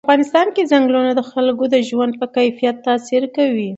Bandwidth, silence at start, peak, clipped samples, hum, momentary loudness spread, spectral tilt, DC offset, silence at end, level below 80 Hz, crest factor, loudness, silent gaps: 8.2 kHz; 0.05 s; 0 dBFS; under 0.1%; none; 5 LU; -5 dB/octave; under 0.1%; 0 s; -68 dBFS; 16 dB; -16 LUFS; none